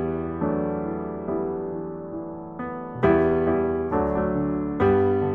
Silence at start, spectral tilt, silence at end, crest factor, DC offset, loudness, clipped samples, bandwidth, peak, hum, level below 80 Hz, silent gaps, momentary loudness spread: 0 s; -10.5 dB/octave; 0 s; 18 dB; 0.2%; -25 LUFS; under 0.1%; 4.1 kHz; -6 dBFS; none; -44 dBFS; none; 13 LU